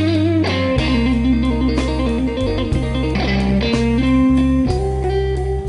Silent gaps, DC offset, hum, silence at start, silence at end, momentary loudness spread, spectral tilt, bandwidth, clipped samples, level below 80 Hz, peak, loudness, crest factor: none; under 0.1%; none; 0 s; 0 s; 5 LU; -7 dB/octave; 10.5 kHz; under 0.1%; -24 dBFS; -4 dBFS; -17 LUFS; 12 dB